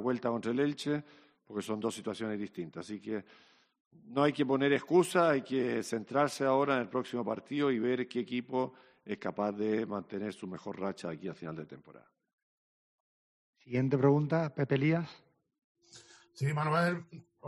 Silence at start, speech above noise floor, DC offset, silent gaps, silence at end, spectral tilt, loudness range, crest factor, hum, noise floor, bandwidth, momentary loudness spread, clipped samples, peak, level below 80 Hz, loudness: 0 s; 26 dB; under 0.1%; 3.80-3.91 s, 12.33-13.53 s, 15.64-15.75 s; 0 s; -6.5 dB/octave; 10 LU; 20 dB; none; -58 dBFS; 12 kHz; 14 LU; under 0.1%; -12 dBFS; -76 dBFS; -33 LUFS